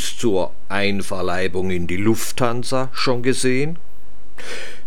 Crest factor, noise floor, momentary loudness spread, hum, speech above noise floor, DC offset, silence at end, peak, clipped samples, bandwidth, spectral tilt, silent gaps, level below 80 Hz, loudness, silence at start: 18 dB; -49 dBFS; 12 LU; none; 27 dB; 10%; 0.05 s; -2 dBFS; under 0.1%; 17.5 kHz; -4.5 dB/octave; none; -48 dBFS; -22 LUFS; 0 s